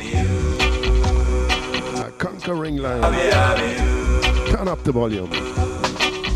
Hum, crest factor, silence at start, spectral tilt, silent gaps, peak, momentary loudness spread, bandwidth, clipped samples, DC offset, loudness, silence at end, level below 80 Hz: none; 12 dB; 0 s; -5 dB/octave; none; -8 dBFS; 8 LU; 12 kHz; under 0.1%; under 0.1%; -20 LUFS; 0 s; -24 dBFS